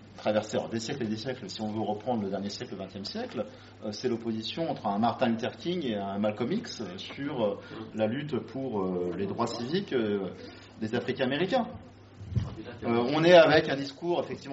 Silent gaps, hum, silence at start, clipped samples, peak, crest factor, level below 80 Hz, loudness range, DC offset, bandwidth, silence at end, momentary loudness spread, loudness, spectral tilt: none; none; 0 s; under 0.1%; -6 dBFS; 22 dB; -58 dBFS; 8 LU; under 0.1%; 8 kHz; 0 s; 11 LU; -30 LUFS; -4.5 dB/octave